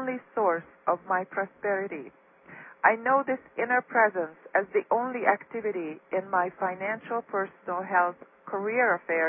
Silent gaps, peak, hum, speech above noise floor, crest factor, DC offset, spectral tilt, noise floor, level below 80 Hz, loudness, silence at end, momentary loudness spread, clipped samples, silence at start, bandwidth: none; -6 dBFS; none; 21 dB; 22 dB; under 0.1%; -10 dB/octave; -49 dBFS; -80 dBFS; -28 LUFS; 0 s; 9 LU; under 0.1%; 0 s; 3.5 kHz